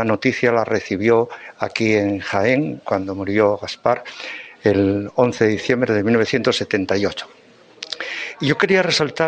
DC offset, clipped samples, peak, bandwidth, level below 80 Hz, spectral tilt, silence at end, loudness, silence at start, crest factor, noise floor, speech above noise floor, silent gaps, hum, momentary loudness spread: under 0.1%; under 0.1%; 0 dBFS; 9.2 kHz; -56 dBFS; -5.5 dB/octave; 0 s; -19 LUFS; 0 s; 18 dB; -39 dBFS; 21 dB; none; none; 11 LU